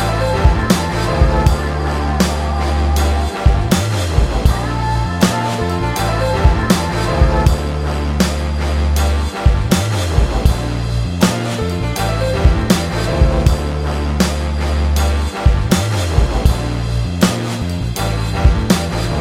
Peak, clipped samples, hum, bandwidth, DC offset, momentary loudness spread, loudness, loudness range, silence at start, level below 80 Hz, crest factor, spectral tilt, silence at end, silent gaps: 0 dBFS; under 0.1%; none; 16.5 kHz; under 0.1%; 5 LU; -16 LUFS; 1 LU; 0 s; -18 dBFS; 14 dB; -5.5 dB/octave; 0 s; none